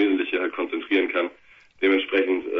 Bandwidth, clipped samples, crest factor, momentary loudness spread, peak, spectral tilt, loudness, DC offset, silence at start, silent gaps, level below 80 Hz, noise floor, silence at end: 5.2 kHz; under 0.1%; 16 dB; 6 LU; -8 dBFS; -5.5 dB/octave; -23 LUFS; under 0.1%; 0 s; none; -68 dBFS; -53 dBFS; 0 s